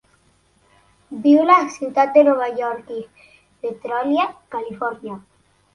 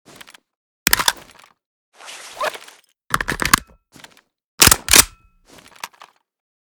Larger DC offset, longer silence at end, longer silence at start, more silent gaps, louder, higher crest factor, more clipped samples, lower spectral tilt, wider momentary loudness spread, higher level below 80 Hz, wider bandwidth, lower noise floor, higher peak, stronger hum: neither; second, 0.55 s vs 0.9 s; first, 1.1 s vs 0.85 s; second, none vs 1.66-1.92 s, 4.44-4.58 s; second, -18 LUFS vs -15 LUFS; about the same, 20 dB vs 22 dB; second, under 0.1% vs 0.1%; first, -5.5 dB/octave vs -0.5 dB/octave; second, 19 LU vs 25 LU; second, -66 dBFS vs -40 dBFS; second, 11 kHz vs over 20 kHz; first, -59 dBFS vs -49 dBFS; about the same, -2 dBFS vs 0 dBFS; neither